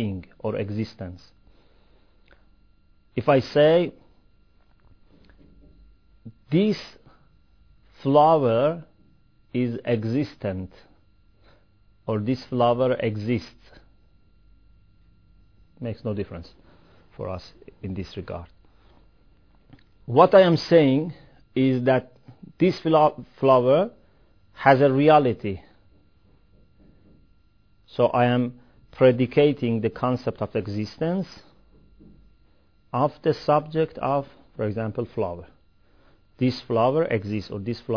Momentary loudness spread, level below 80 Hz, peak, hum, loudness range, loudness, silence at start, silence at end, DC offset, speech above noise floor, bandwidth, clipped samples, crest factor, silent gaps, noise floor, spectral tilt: 18 LU; -56 dBFS; -2 dBFS; none; 14 LU; -23 LUFS; 0 s; 0 s; 0.1%; 39 dB; 5.4 kHz; under 0.1%; 24 dB; none; -61 dBFS; -8 dB/octave